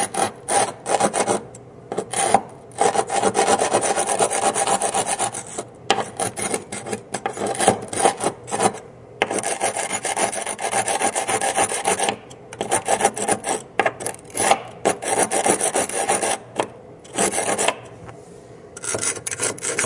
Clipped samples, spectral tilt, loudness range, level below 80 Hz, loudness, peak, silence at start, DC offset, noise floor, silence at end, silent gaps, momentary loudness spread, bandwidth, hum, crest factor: under 0.1%; -2 dB/octave; 3 LU; -60 dBFS; -21 LUFS; 0 dBFS; 0 s; under 0.1%; -42 dBFS; 0 s; none; 11 LU; 11.5 kHz; none; 22 dB